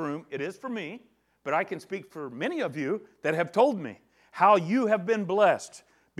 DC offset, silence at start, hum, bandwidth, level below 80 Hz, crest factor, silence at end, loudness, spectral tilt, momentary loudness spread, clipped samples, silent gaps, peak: under 0.1%; 0 s; none; 13 kHz; -80 dBFS; 20 dB; 0.4 s; -27 LUFS; -6 dB/octave; 17 LU; under 0.1%; none; -8 dBFS